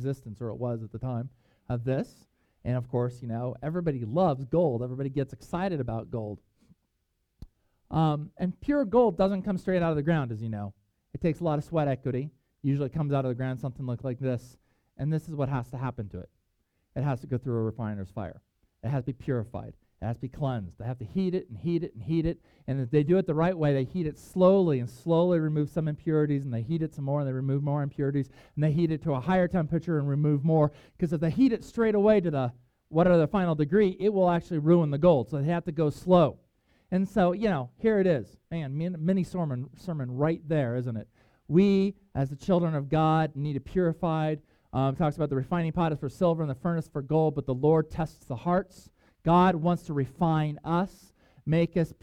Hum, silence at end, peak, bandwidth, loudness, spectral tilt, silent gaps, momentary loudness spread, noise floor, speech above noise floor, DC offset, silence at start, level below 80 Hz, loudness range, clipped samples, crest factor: none; 0.1 s; -8 dBFS; 10 kHz; -28 LUFS; -9 dB/octave; none; 12 LU; -77 dBFS; 50 dB; under 0.1%; 0 s; -54 dBFS; 8 LU; under 0.1%; 20 dB